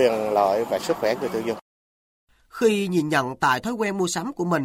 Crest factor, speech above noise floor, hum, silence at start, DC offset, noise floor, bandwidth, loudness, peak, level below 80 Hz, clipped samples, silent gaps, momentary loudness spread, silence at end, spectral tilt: 16 dB; over 67 dB; none; 0 s; under 0.1%; under -90 dBFS; 16 kHz; -23 LUFS; -6 dBFS; -60 dBFS; under 0.1%; 1.61-2.27 s; 7 LU; 0 s; -5 dB/octave